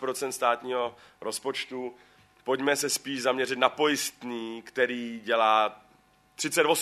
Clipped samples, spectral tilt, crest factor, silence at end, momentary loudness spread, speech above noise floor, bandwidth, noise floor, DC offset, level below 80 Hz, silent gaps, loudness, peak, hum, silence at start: under 0.1%; -2 dB/octave; 22 dB; 0 s; 12 LU; 34 dB; 13.5 kHz; -62 dBFS; under 0.1%; -76 dBFS; none; -28 LUFS; -6 dBFS; none; 0 s